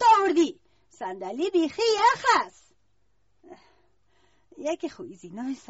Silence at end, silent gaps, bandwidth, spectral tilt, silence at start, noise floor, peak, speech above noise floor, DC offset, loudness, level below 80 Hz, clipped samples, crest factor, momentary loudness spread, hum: 0.15 s; none; 8 kHz; -1 dB/octave; 0 s; -72 dBFS; -8 dBFS; 46 dB; under 0.1%; -25 LUFS; -66 dBFS; under 0.1%; 18 dB; 17 LU; none